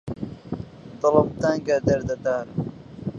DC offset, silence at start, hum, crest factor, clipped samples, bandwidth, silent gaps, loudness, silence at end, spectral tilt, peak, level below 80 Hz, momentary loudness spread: under 0.1%; 0.05 s; none; 22 dB; under 0.1%; 7.6 kHz; none; -23 LUFS; 0 s; -7 dB/octave; -2 dBFS; -48 dBFS; 15 LU